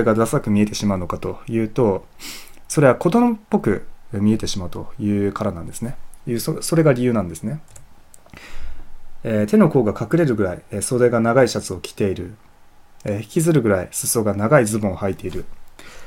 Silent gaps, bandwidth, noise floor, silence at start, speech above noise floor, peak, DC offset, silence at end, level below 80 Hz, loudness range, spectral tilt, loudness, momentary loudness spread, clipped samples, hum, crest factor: none; 16.5 kHz; -46 dBFS; 0 s; 27 dB; 0 dBFS; under 0.1%; 0 s; -40 dBFS; 4 LU; -6 dB/octave; -20 LUFS; 16 LU; under 0.1%; none; 20 dB